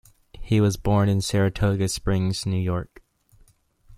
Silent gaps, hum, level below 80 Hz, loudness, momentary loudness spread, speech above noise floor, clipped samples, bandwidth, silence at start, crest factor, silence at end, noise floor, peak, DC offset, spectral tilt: none; none; -42 dBFS; -23 LUFS; 6 LU; 36 dB; under 0.1%; 15 kHz; 0.35 s; 16 dB; 0 s; -58 dBFS; -8 dBFS; under 0.1%; -6 dB/octave